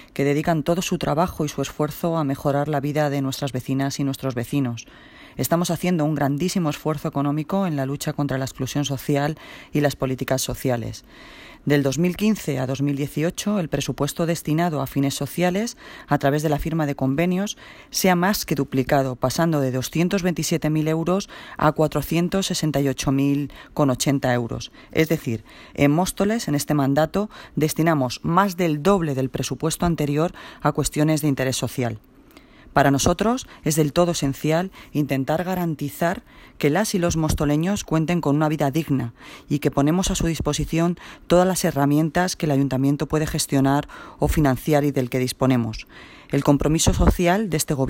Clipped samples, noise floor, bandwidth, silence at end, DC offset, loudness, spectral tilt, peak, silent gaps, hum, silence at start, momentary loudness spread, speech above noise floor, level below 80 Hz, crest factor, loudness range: under 0.1%; -49 dBFS; 16.5 kHz; 0 s; under 0.1%; -22 LUFS; -5.5 dB/octave; -2 dBFS; none; none; 0 s; 7 LU; 27 dB; -40 dBFS; 18 dB; 3 LU